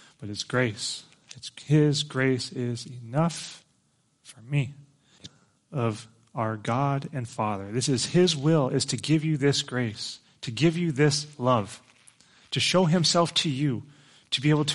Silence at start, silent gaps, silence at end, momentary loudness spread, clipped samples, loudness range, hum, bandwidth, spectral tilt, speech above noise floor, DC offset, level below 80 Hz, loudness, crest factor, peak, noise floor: 0.2 s; none; 0 s; 15 LU; under 0.1%; 8 LU; none; 11.5 kHz; -5 dB/octave; 43 dB; under 0.1%; -64 dBFS; -26 LUFS; 18 dB; -8 dBFS; -69 dBFS